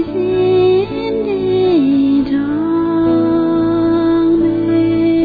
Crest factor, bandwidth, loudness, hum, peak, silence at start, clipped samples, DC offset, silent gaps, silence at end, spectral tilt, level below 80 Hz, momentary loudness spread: 10 dB; 4.9 kHz; -14 LUFS; none; -4 dBFS; 0 s; under 0.1%; under 0.1%; none; 0 s; -10 dB/octave; -42 dBFS; 4 LU